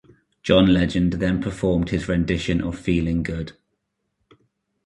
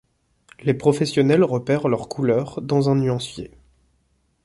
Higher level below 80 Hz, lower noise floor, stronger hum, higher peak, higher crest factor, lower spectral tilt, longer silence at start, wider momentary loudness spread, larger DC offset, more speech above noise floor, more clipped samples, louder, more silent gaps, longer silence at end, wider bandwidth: first, -38 dBFS vs -54 dBFS; first, -75 dBFS vs -66 dBFS; neither; about the same, -2 dBFS vs -4 dBFS; about the same, 20 dB vs 18 dB; about the same, -7 dB/octave vs -7 dB/octave; second, 0.45 s vs 0.65 s; about the same, 11 LU vs 10 LU; neither; first, 55 dB vs 46 dB; neither; about the same, -21 LUFS vs -20 LUFS; neither; first, 1.35 s vs 0.95 s; about the same, 11 kHz vs 11.5 kHz